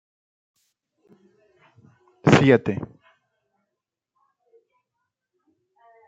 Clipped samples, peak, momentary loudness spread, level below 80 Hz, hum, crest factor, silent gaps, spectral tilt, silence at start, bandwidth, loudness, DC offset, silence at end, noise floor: under 0.1%; -2 dBFS; 18 LU; -62 dBFS; none; 24 dB; none; -6.5 dB/octave; 2.25 s; 8.8 kHz; -19 LUFS; under 0.1%; 3.25 s; -84 dBFS